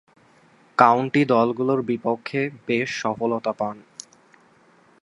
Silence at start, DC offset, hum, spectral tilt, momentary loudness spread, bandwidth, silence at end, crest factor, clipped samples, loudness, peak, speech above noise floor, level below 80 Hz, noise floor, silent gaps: 0.8 s; under 0.1%; none; -6 dB/octave; 12 LU; 11 kHz; 1.25 s; 24 dB; under 0.1%; -22 LUFS; 0 dBFS; 35 dB; -68 dBFS; -56 dBFS; none